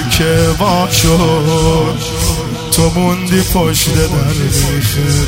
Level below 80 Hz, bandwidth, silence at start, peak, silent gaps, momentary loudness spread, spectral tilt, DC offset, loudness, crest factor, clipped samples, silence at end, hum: -24 dBFS; 16.5 kHz; 0 s; 0 dBFS; none; 5 LU; -4.5 dB/octave; 0.4%; -12 LUFS; 12 dB; under 0.1%; 0 s; none